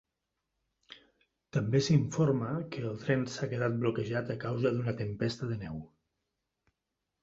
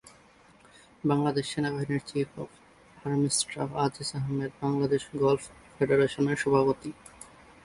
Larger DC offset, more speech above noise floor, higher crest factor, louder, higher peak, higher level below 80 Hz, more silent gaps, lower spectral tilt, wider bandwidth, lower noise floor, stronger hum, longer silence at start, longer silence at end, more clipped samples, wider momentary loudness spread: neither; first, 55 dB vs 30 dB; about the same, 20 dB vs 20 dB; second, -32 LUFS vs -28 LUFS; second, -14 dBFS vs -8 dBFS; about the same, -62 dBFS vs -60 dBFS; neither; first, -6.5 dB/octave vs -5 dB/octave; second, 7.8 kHz vs 11.5 kHz; first, -86 dBFS vs -58 dBFS; neither; first, 0.9 s vs 0.05 s; first, 1.35 s vs 0.4 s; neither; second, 10 LU vs 18 LU